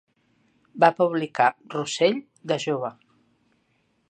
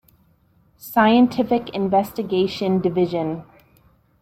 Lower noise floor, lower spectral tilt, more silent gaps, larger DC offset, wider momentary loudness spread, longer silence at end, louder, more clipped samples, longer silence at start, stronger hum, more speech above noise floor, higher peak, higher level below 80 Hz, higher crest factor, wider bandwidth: first, -69 dBFS vs -59 dBFS; second, -4.5 dB/octave vs -7 dB/octave; neither; neither; about the same, 12 LU vs 11 LU; first, 1.15 s vs 0.8 s; second, -24 LUFS vs -20 LUFS; neither; about the same, 0.75 s vs 0.85 s; neither; first, 45 dB vs 40 dB; about the same, -2 dBFS vs -2 dBFS; second, -78 dBFS vs -58 dBFS; about the same, 22 dB vs 18 dB; second, 9.2 kHz vs 16 kHz